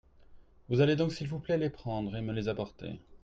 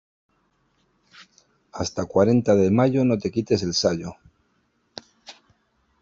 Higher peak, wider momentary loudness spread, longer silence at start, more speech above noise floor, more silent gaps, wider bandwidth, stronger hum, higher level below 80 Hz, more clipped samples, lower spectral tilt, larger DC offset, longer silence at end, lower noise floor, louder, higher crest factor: second, -14 dBFS vs -6 dBFS; second, 12 LU vs 24 LU; second, 0.3 s vs 1.2 s; second, 24 dB vs 47 dB; neither; about the same, 7.8 kHz vs 7.8 kHz; neither; about the same, -56 dBFS vs -58 dBFS; neither; first, -7.5 dB/octave vs -6 dB/octave; neither; second, 0.05 s vs 0.7 s; second, -55 dBFS vs -68 dBFS; second, -32 LUFS vs -21 LUFS; about the same, 18 dB vs 20 dB